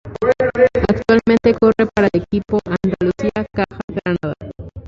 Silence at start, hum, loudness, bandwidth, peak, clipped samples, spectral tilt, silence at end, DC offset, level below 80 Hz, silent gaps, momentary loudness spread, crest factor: 0.05 s; none; -17 LUFS; 7.6 kHz; -2 dBFS; under 0.1%; -8 dB/octave; 0 s; under 0.1%; -38 dBFS; 3.84-3.88 s; 9 LU; 14 dB